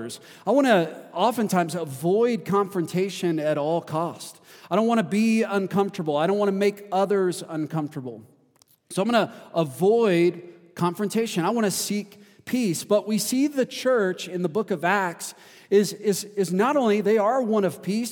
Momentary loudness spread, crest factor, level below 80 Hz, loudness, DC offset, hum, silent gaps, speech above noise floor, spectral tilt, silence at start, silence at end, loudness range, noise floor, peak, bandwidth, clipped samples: 10 LU; 18 dB; -78 dBFS; -24 LUFS; under 0.1%; none; none; 38 dB; -5 dB/octave; 0 s; 0 s; 2 LU; -61 dBFS; -4 dBFS; 19 kHz; under 0.1%